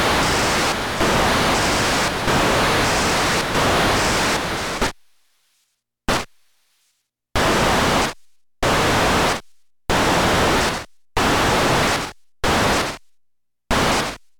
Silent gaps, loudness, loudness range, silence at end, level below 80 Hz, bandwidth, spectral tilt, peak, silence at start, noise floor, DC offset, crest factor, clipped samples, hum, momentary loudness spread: none; -18 LUFS; 5 LU; 0.2 s; -34 dBFS; 19 kHz; -3.5 dB/octave; -6 dBFS; 0 s; -70 dBFS; under 0.1%; 14 dB; under 0.1%; none; 8 LU